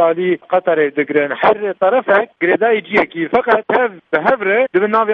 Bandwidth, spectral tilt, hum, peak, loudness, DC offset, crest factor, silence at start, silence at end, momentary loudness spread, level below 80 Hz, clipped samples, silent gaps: 5.6 kHz; -7.5 dB/octave; none; 0 dBFS; -15 LUFS; under 0.1%; 14 dB; 0 s; 0 s; 3 LU; -58 dBFS; under 0.1%; none